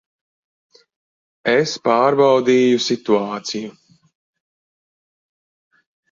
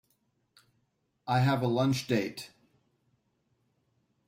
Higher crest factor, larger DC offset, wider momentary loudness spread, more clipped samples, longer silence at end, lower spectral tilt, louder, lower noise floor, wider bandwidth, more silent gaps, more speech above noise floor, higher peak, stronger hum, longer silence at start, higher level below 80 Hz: about the same, 20 dB vs 18 dB; neither; second, 12 LU vs 18 LU; neither; first, 2.4 s vs 1.8 s; second, -4.5 dB/octave vs -6.5 dB/octave; first, -17 LUFS vs -29 LUFS; first, under -90 dBFS vs -76 dBFS; second, 7.6 kHz vs 16 kHz; neither; first, over 74 dB vs 48 dB; first, 0 dBFS vs -16 dBFS; neither; first, 1.45 s vs 1.25 s; about the same, -66 dBFS vs -68 dBFS